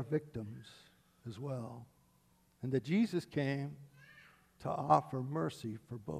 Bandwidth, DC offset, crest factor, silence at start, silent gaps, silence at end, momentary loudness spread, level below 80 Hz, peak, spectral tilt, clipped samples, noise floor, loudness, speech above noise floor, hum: 13 kHz; under 0.1%; 26 dB; 0 s; none; 0 s; 22 LU; -72 dBFS; -12 dBFS; -7.5 dB/octave; under 0.1%; -71 dBFS; -37 LUFS; 34 dB; none